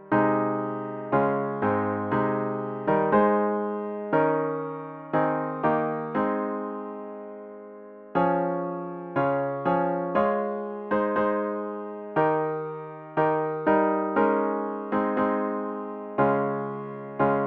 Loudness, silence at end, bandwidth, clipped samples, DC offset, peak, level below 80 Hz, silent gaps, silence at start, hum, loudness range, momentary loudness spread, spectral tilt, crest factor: -26 LUFS; 0 s; 4.7 kHz; under 0.1%; under 0.1%; -8 dBFS; -62 dBFS; none; 0 s; none; 4 LU; 12 LU; -10.5 dB/octave; 18 dB